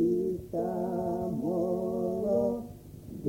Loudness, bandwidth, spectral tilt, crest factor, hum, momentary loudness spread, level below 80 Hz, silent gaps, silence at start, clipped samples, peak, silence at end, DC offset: -31 LUFS; 17 kHz; -9.5 dB/octave; 14 dB; none; 11 LU; -56 dBFS; none; 0 s; under 0.1%; -16 dBFS; 0 s; under 0.1%